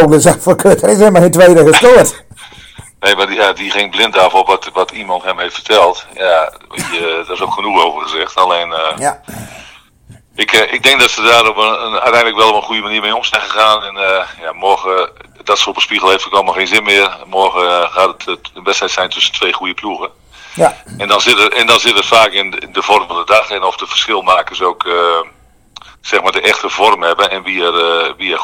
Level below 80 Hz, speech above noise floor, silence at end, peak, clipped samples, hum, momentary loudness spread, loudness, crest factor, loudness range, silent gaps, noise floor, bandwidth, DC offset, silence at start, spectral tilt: -46 dBFS; 30 dB; 0 s; 0 dBFS; 2%; none; 11 LU; -10 LUFS; 12 dB; 5 LU; none; -41 dBFS; over 20 kHz; under 0.1%; 0 s; -3 dB/octave